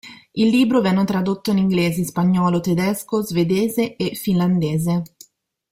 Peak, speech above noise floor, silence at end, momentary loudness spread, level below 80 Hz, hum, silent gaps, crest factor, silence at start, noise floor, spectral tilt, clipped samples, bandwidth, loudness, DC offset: -6 dBFS; 34 dB; 0.65 s; 6 LU; -54 dBFS; none; none; 14 dB; 0.05 s; -52 dBFS; -6.5 dB/octave; under 0.1%; 16 kHz; -19 LUFS; under 0.1%